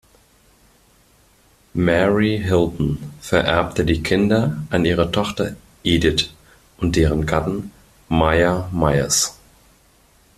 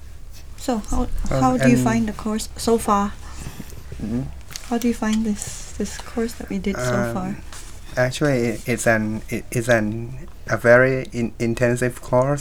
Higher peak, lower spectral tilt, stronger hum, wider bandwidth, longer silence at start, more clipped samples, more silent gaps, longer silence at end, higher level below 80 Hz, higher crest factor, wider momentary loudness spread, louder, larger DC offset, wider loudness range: about the same, 0 dBFS vs -2 dBFS; about the same, -5 dB/octave vs -5.5 dB/octave; neither; second, 14.5 kHz vs 18 kHz; first, 1.75 s vs 0 s; neither; neither; first, 1.05 s vs 0 s; about the same, -36 dBFS vs -34 dBFS; about the same, 20 dB vs 20 dB; second, 9 LU vs 18 LU; about the same, -19 LUFS vs -21 LUFS; second, under 0.1% vs 1%; second, 2 LU vs 6 LU